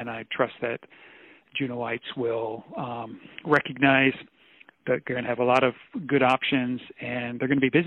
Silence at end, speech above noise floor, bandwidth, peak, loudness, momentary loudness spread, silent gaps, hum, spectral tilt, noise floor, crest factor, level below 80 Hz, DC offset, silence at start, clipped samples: 0 s; 30 dB; 8.4 kHz; -8 dBFS; -26 LUFS; 14 LU; none; none; -7 dB/octave; -56 dBFS; 20 dB; -66 dBFS; under 0.1%; 0 s; under 0.1%